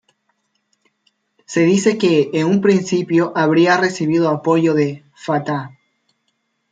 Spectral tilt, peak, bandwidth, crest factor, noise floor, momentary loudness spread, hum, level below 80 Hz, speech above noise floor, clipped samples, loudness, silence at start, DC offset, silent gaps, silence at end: -6 dB/octave; -2 dBFS; 9.2 kHz; 16 dB; -69 dBFS; 9 LU; none; -64 dBFS; 54 dB; under 0.1%; -16 LUFS; 1.5 s; under 0.1%; none; 1.05 s